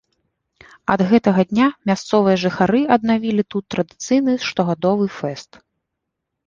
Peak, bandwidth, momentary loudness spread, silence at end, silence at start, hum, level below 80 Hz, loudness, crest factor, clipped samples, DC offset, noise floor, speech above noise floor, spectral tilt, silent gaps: -2 dBFS; 7.6 kHz; 9 LU; 1.05 s; 0.9 s; none; -54 dBFS; -18 LUFS; 16 dB; under 0.1%; under 0.1%; -79 dBFS; 61 dB; -6 dB/octave; none